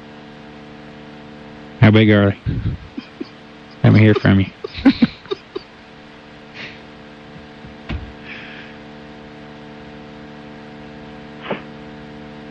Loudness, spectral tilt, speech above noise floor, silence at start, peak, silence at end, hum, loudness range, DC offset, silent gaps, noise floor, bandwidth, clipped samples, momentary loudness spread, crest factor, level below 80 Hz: -16 LUFS; -8.5 dB/octave; 27 dB; 0.9 s; -2 dBFS; 0 s; none; 19 LU; under 0.1%; none; -41 dBFS; 6.2 kHz; under 0.1%; 26 LU; 18 dB; -42 dBFS